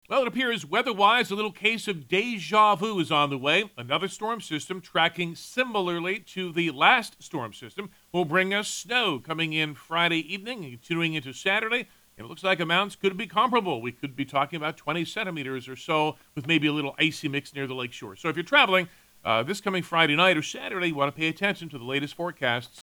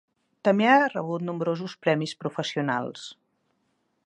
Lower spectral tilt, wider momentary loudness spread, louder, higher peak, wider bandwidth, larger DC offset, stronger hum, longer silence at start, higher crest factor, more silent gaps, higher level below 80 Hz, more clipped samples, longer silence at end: second, -4 dB/octave vs -6 dB/octave; about the same, 13 LU vs 12 LU; about the same, -26 LUFS vs -25 LUFS; about the same, -4 dBFS vs -6 dBFS; first, over 20 kHz vs 11 kHz; neither; neither; second, 0.1 s vs 0.45 s; about the same, 22 dB vs 20 dB; neither; first, -70 dBFS vs -78 dBFS; neither; second, 0 s vs 0.9 s